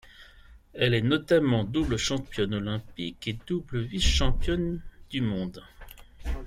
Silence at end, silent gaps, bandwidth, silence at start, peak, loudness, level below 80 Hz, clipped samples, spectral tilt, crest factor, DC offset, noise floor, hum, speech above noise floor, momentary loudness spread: 0 s; none; 15.5 kHz; 0.2 s; -10 dBFS; -28 LUFS; -36 dBFS; under 0.1%; -5 dB/octave; 18 dB; under 0.1%; -52 dBFS; none; 26 dB; 14 LU